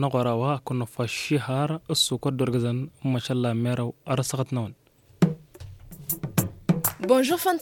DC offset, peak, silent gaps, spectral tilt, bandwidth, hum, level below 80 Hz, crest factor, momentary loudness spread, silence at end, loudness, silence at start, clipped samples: under 0.1%; -6 dBFS; none; -5 dB/octave; 17 kHz; none; -56 dBFS; 20 dB; 9 LU; 0 s; -26 LUFS; 0 s; under 0.1%